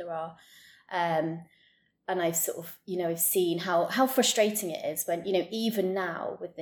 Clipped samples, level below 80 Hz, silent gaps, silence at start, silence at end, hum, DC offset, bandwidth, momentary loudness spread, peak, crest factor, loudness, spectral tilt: under 0.1%; -78 dBFS; none; 0 s; 0 s; none; under 0.1%; 19 kHz; 13 LU; -12 dBFS; 18 dB; -29 LUFS; -3 dB/octave